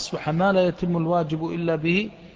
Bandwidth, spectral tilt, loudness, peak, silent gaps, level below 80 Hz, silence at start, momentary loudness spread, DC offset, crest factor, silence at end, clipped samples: 8 kHz; -6.5 dB/octave; -23 LUFS; -8 dBFS; none; -52 dBFS; 0 s; 6 LU; under 0.1%; 14 dB; 0.05 s; under 0.1%